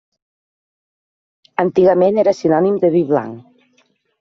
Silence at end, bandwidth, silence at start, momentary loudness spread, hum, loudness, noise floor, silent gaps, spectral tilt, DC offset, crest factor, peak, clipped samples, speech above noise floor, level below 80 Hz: 0.8 s; 7.2 kHz; 1.6 s; 8 LU; none; -15 LUFS; -60 dBFS; none; -7 dB/octave; under 0.1%; 14 dB; -2 dBFS; under 0.1%; 46 dB; -60 dBFS